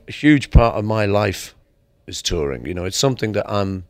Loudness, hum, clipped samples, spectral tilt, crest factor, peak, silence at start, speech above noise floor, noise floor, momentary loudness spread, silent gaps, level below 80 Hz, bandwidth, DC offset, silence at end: -19 LUFS; none; under 0.1%; -5.5 dB/octave; 18 dB; 0 dBFS; 0.1 s; 39 dB; -57 dBFS; 11 LU; none; -26 dBFS; 16 kHz; under 0.1%; 0.05 s